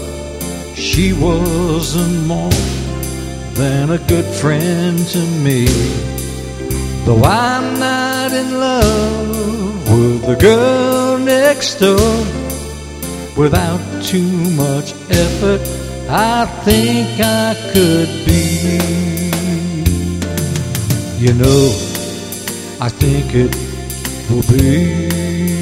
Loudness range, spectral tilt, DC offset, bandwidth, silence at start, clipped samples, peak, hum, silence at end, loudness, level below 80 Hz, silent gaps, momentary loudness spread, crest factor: 4 LU; -5.5 dB/octave; under 0.1%; 16.5 kHz; 0 s; under 0.1%; 0 dBFS; none; 0 s; -15 LUFS; -26 dBFS; none; 11 LU; 14 dB